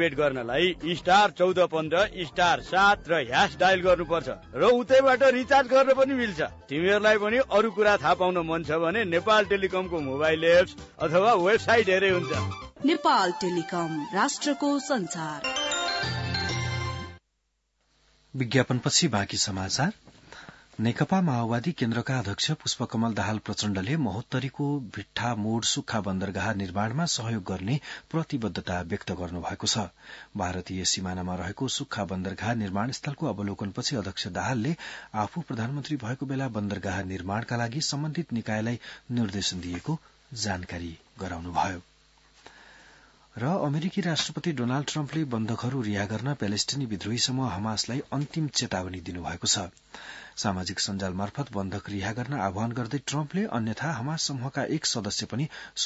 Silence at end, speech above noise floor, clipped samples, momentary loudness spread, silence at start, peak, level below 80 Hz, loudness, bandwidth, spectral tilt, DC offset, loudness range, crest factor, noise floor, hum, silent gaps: 0 s; 49 dB; under 0.1%; 11 LU; 0 s; -6 dBFS; -56 dBFS; -27 LUFS; 8 kHz; -4.5 dB/octave; under 0.1%; 9 LU; 20 dB; -76 dBFS; none; none